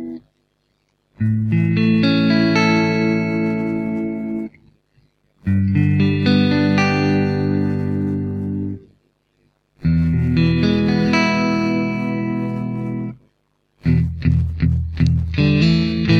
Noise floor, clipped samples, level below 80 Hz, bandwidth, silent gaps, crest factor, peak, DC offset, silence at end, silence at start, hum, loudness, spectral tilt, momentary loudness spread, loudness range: -66 dBFS; under 0.1%; -34 dBFS; 7 kHz; none; 14 dB; -4 dBFS; under 0.1%; 0 s; 0 s; 50 Hz at -45 dBFS; -18 LUFS; -7.5 dB/octave; 10 LU; 4 LU